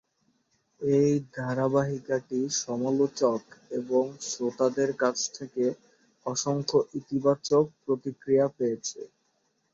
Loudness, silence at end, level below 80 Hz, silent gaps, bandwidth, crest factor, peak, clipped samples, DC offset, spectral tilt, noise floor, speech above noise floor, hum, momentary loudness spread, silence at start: -28 LUFS; 0.65 s; -70 dBFS; none; 7.8 kHz; 18 dB; -10 dBFS; under 0.1%; under 0.1%; -5 dB/octave; -73 dBFS; 46 dB; none; 10 LU; 0.8 s